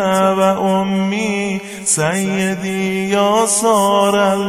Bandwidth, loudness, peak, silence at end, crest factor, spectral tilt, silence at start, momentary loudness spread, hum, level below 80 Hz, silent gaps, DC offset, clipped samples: 16 kHz; -15 LUFS; -2 dBFS; 0 s; 14 dB; -4 dB/octave; 0 s; 6 LU; none; -56 dBFS; none; under 0.1%; under 0.1%